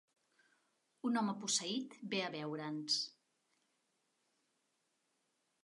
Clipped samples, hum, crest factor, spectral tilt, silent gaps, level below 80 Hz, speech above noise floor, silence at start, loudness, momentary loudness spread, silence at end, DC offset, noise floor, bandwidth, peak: under 0.1%; none; 22 dB; -2.5 dB/octave; none; under -90 dBFS; 43 dB; 1.05 s; -39 LUFS; 7 LU; 2.55 s; under 0.1%; -83 dBFS; 11.5 kHz; -22 dBFS